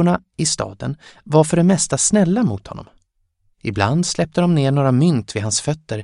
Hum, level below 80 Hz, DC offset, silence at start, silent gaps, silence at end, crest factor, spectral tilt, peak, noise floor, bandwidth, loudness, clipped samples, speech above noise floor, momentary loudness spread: none; -48 dBFS; under 0.1%; 0 s; none; 0 s; 16 dB; -5 dB/octave; -2 dBFS; -65 dBFS; 11.5 kHz; -17 LUFS; under 0.1%; 47 dB; 14 LU